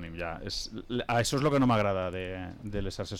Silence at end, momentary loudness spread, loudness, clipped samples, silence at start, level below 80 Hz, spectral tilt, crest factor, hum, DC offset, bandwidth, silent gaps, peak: 0 s; 12 LU; -30 LUFS; under 0.1%; 0 s; -46 dBFS; -5 dB/octave; 12 dB; none; under 0.1%; 16.5 kHz; none; -18 dBFS